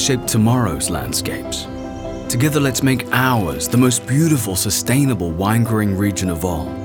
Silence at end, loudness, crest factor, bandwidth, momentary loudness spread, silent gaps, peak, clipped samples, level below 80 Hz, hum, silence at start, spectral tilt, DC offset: 0 s; -17 LUFS; 16 dB; over 20 kHz; 9 LU; none; -2 dBFS; under 0.1%; -40 dBFS; none; 0 s; -4.5 dB/octave; under 0.1%